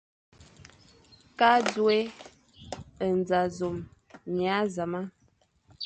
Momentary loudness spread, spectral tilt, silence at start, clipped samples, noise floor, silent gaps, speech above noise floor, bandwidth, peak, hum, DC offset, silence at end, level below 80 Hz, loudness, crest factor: 21 LU; -5 dB/octave; 1.4 s; under 0.1%; -67 dBFS; none; 41 dB; 9 kHz; -8 dBFS; none; under 0.1%; 0 s; -60 dBFS; -27 LUFS; 20 dB